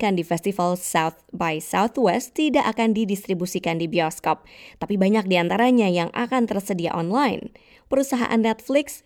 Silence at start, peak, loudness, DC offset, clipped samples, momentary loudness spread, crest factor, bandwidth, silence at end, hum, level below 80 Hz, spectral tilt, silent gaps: 0 s; -6 dBFS; -22 LUFS; under 0.1%; under 0.1%; 7 LU; 16 dB; 18 kHz; 0.1 s; none; -58 dBFS; -5 dB/octave; none